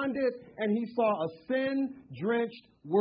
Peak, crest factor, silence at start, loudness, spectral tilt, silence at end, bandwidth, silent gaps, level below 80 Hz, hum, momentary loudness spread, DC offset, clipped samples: -16 dBFS; 16 dB; 0 s; -31 LUFS; -10 dB/octave; 0 s; 5.2 kHz; none; -72 dBFS; none; 8 LU; under 0.1%; under 0.1%